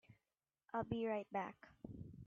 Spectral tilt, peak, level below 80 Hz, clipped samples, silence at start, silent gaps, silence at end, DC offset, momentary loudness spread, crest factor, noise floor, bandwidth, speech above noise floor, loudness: -6 dB/octave; -28 dBFS; -72 dBFS; under 0.1%; 0.1 s; none; 0 s; under 0.1%; 14 LU; 18 dB; under -90 dBFS; 7.2 kHz; over 46 dB; -45 LUFS